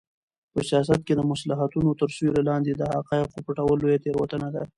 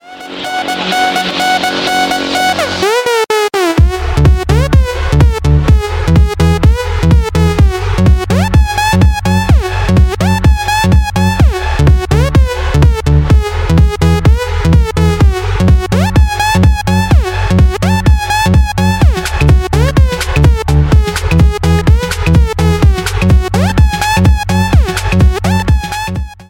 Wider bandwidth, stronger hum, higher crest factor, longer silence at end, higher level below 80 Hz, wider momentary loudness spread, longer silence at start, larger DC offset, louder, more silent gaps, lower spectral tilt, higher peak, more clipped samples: second, 11.5 kHz vs 17 kHz; neither; first, 18 dB vs 10 dB; about the same, 0.1 s vs 0.05 s; second, -52 dBFS vs -14 dBFS; first, 6 LU vs 3 LU; first, 0.55 s vs 0.05 s; neither; second, -25 LUFS vs -11 LUFS; neither; about the same, -7 dB/octave vs -6 dB/octave; second, -6 dBFS vs 0 dBFS; second, under 0.1% vs 0.5%